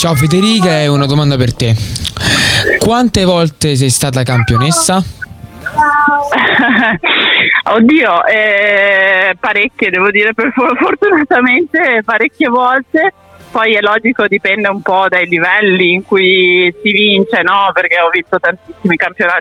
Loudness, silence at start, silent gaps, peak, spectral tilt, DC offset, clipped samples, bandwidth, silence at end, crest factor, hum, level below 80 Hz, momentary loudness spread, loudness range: -10 LUFS; 0 s; none; 0 dBFS; -4.5 dB/octave; under 0.1%; under 0.1%; 17 kHz; 0 s; 10 dB; none; -36 dBFS; 5 LU; 3 LU